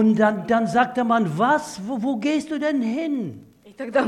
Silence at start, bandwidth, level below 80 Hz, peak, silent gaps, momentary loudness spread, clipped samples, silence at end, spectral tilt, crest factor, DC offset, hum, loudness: 0 s; 12 kHz; -64 dBFS; -4 dBFS; none; 9 LU; under 0.1%; 0 s; -6 dB/octave; 18 dB; under 0.1%; none; -22 LUFS